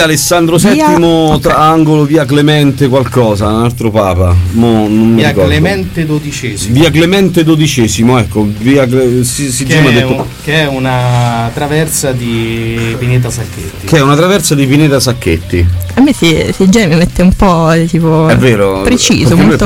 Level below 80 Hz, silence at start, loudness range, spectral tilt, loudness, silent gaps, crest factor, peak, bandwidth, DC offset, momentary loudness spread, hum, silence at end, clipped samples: -26 dBFS; 0 s; 3 LU; -5.5 dB/octave; -9 LUFS; none; 8 dB; 0 dBFS; 16.5 kHz; under 0.1%; 7 LU; none; 0 s; 0.3%